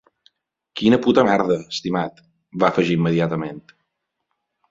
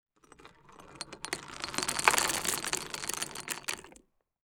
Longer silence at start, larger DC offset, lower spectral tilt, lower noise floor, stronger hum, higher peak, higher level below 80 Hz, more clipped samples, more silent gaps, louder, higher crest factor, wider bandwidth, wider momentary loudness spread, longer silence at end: first, 0.75 s vs 0.4 s; neither; first, -6.5 dB/octave vs -0.5 dB/octave; first, -77 dBFS vs -62 dBFS; neither; about the same, -2 dBFS vs -2 dBFS; first, -56 dBFS vs -62 dBFS; neither; neither; first, -19 LUFS vs -32 LUFS; second, 20 dB vs 34 dB; second, 7.8 kHz vs over 20 kHz; about the same, 16 LU vs 16 LU; first, 1.1 s vs 0.55 s